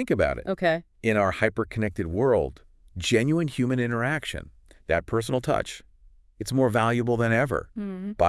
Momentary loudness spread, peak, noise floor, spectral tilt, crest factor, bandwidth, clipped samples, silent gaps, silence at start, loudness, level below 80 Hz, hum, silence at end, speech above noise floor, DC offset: 12 LU; -6 dBFS; -55 dBFS; -6 dB/octave; 20 dB; 12 kHz; under 0.1%; none; 0 s; -25 LUFS; -48 dBFS; none; 0 s; 30 dB; under 0.1%